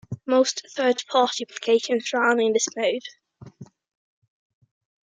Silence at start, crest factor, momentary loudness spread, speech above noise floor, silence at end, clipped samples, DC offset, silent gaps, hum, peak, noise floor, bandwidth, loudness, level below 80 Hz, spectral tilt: 0.1 s; 18 dB; 5 LU; 23 dB; 1.4 s; under 0.1%; under 0.1%; none; none; -6 dBFS; -45 dBFS; 9.6 kHz; -23 LUFS; -72 dBFS; -3 dB/octave